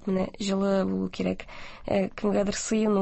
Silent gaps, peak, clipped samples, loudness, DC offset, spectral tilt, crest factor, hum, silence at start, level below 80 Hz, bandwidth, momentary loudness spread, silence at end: none; -12 dBFS; under 0.1%; -27 LUFS; under 0.1%; -5.5 dB/octave; 14 dB; none; 0 s; -50 dBFS; 8.4 kHz; 8 LU; 0 s